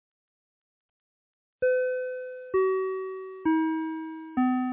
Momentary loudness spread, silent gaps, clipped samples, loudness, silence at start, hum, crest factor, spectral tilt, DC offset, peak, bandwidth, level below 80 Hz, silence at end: 9 LU; none; under 0.1%; -29 LUFS; 1.6 s; none; 14 dB; -4.5 dB/octave; under 0.1%; -16 dBFS; 3.8 kHz; -68 dBFS; 0 s